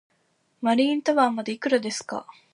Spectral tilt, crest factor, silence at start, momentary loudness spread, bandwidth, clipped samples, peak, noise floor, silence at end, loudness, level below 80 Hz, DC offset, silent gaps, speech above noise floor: -3.5 dB/octave; 18 dB; 0.6 s; 11 LU; 11.5 kHz; under 0.1%; -8 dBFS; -68 dBFS; 0.25 s; -24 LUFS; -78 dBFS; under 0.1%; none; 45 dB